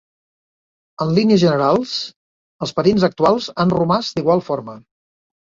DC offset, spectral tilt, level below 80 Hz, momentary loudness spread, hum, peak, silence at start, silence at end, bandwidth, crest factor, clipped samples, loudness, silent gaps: under 0.1%; -6.5 dB/octave; -54 dBFS; 12 LU; none; -2 dBFS; 1 s; 0.8 s; 7.6 kHz; 16 dB; under 0.1%; -17 LUFS; 2.16-2.59 s